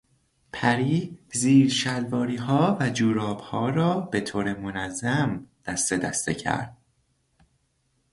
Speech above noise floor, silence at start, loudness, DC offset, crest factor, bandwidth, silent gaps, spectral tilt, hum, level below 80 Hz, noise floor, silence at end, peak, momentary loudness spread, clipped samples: 46 dB; 0.55 s; -25 LUFS; under 0.1%; 18 dB; 11.5 kHz; none; -5 dB/octave; none; -56 dBFS; -70 dBFS; 1.4 s; -8 dBFS; 10 LU; under 0.1%